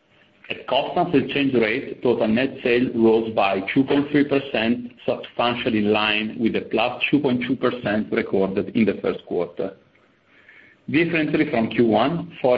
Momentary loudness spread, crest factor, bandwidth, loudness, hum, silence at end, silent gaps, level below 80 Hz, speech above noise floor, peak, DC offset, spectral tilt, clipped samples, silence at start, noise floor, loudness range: 8 LU; 16 dB; 5.2 kHz; -21 LUFS; none; 0 s; none; -56 dBFS; 37 dB; -4 dBFS; under 0.1%; -9 dB/octave; under 0.1%; 0.5 s; -58 dBFS; 4 LU